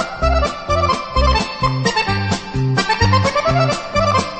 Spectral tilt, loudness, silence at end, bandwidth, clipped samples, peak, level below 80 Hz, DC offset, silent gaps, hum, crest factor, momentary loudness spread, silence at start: -5 dB/octave; -17 LUFS; 0 s; 8.8 kHz; under 0.1%; -2 dBFS; -26 dBFS; under 0.1%; none; none; 14 dB; 4 LU; 0 s